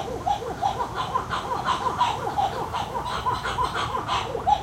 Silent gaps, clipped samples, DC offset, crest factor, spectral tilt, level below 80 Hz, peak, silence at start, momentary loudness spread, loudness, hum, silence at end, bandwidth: none; under 0.1%; under 0.1%; 18 dB; -4 dB/octave; -44 dBFS; -8 dBFS; 0 s; 4 LU; -26 LUFS; none; 0 s; 16 kHz